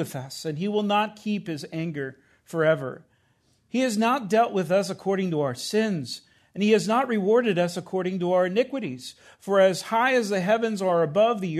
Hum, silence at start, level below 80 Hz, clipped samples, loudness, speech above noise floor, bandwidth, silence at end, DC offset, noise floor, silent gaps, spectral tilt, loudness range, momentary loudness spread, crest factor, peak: none; 0 s; -72 dBFS; under 0.1%; -24 LUFS; 42 dB; 13.5 kHz; 0 s; under 0.1%; -66 dBFS; none; -5.5 dB/octave; 4 LU; 13 LU; 16 dB; -8 dBFS